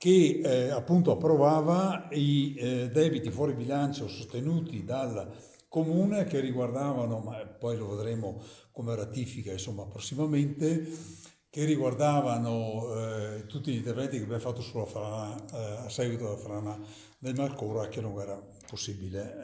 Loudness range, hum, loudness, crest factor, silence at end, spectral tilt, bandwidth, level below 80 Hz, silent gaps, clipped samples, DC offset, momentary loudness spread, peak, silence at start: 9 LU; none; -31 LUFS; 20 dB; 0 s; -6.5 dB/octave; 8 kHz; -60 dBFS; none; under 0.1%; under 0.1%; 14 LU; -10 dBFS; 0 s